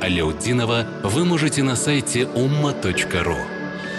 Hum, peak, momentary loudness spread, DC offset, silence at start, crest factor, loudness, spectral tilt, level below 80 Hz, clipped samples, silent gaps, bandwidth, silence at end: none; -8 dBFS; 4 LU; under 0.1%; 0 s; 12 dB; -21 LUFS; -4.5 dB/octave; -40 dBFS; under 0.1%; none; 12.5 kHz; 0 s